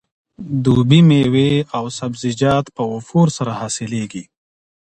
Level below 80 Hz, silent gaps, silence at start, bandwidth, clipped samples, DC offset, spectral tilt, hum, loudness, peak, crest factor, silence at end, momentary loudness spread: -48 dBFS; none; 0.4 s; 9.6 kHz; under 0.1%; under 0.1%; -6.5 dB/octave; none; -16 LUFS; 0 dBFS; 16 dB; 0.75 s; 14 LU